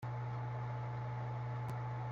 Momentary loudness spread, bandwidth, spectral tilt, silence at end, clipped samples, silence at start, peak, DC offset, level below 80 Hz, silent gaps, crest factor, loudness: 0 LU; 6.6 kHz; -8.5 dB/octave; 0 s; under 0.1%; 0 s; -32 dBFS; under 0.1%; -64 dBFS; none; 8 dB; -42 LUFS